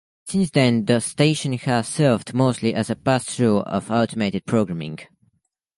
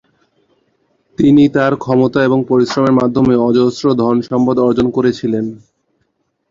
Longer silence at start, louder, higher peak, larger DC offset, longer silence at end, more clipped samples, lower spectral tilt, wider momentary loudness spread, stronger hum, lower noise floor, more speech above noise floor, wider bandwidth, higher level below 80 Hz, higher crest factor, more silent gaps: second, 0.25 s vs 1.2 s; second, -21 LUFS vs -13 LUFS; about the same, -2 dBFS vs 0 dBFS; neither; second, 0.75 s vs 0.95 s; neither; second, -5.5 dB/octave vs -7.5 dB/octave; about the same, 7 LU vs 6 LU; neither; about the same, -68 dBFS vs -65 dBFS; second, 48 dB vs 53 dB; first, 11.5 kHz vs 7.6 kHz; second, -56 dBFS vs -46 dBFS; first, 18 dB vs 12 dB; neither